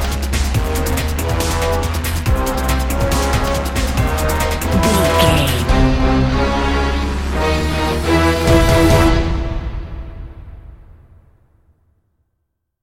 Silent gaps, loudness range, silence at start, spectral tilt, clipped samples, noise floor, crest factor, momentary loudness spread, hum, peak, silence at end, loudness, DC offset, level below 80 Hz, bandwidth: none; 4 LU; 0 s; -5 dB/octave; under 0.1%; -71 dBFS; 16 dB; 8 LU; none; 0 dBFS; 2.05 s; -16 LUFS; under 0.1%; -20 dBFS; 17 kHz